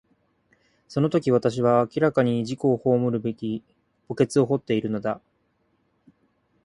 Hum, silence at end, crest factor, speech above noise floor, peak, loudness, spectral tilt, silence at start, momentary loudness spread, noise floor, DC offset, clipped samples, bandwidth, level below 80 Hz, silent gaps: none; 1.45 s; 18 dB; 46 dB; -6 dBFS; -24 LUFS; -7.5 dB/octave; 0.9 s; 11 LU; -69 dBFS; under 0.1%; under 0.1%; 11.5 kHz; -62 dBFS; none